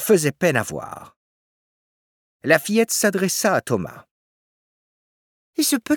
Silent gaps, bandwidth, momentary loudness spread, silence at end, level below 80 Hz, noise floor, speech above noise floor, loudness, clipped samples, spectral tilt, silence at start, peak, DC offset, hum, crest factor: 1.16-2.40 s, 4.11-5.53 s; 19.5 kHz; 15 LU; 0 s; -64 dBFS; under -90 dBFS; over 70 dB; -20 LUFS; under 0.1%; -4 dB/octave; 0 s; -2 dBFS; under 0.1%; none; 22 dB